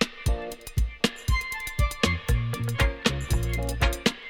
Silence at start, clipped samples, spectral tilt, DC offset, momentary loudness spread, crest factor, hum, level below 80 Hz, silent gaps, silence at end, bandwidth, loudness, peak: 0 s; under 0.1%; -4.5 dB/octave; under 0.1%; 6 LU; 18 dB; none; -30 dBFS; none; 0 s; 18 kHz; -27 LUFS; -8 dBFS